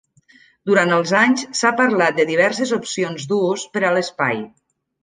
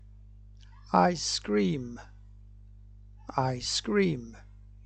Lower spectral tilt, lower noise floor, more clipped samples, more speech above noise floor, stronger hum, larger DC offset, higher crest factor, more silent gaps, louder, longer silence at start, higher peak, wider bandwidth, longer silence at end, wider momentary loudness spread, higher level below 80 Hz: about the same, -4 dB/octave vs -4.5 dB/octave; about the same, -53 dBFS vs -51 dBFS; neither; first, 35 dB vs 22 dB; second, none vs 50 Hz at -50 dBFS; neither; second, 18 dB vs 24 dB; neither; first, -18 LUFS vs -28 LUFS; first, 0.65 s vs 0.05 s; first, -2 dBFS vs -8 dBFS; about the same, 10 kHz vs 9.2 kHz; about the same, 0.55 s vs 0.45 s; second, 8 LU vs 19 LU; second, -68 dBFS vs -52 dBFS